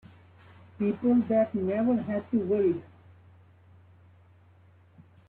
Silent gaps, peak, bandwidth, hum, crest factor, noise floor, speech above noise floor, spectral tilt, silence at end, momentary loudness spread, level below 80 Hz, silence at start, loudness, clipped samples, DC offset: none; -14 dBFS; 3.9 kHz; none; 16 dB; -58 dBFS; 32 dB; -11.5 dB/octave; 0.3 s; 7 LU; -68 dBFS; 0.8 s; -27 LUFS; under 0.1%; under 0.1%